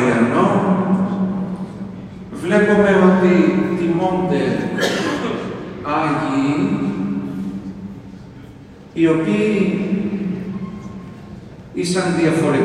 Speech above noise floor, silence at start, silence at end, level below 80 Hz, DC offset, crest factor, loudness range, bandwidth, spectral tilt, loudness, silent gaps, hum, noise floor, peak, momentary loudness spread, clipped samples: 23 dB; 0 s; 0 s; -48 dBFS; under 0.1%; 18 dB; 6 LU; 11.5 kHz; -6.5 dB/octave; -18 LUFS; none; none; -39 dBFS; 0 dBFS; 20 LU; under 0.1%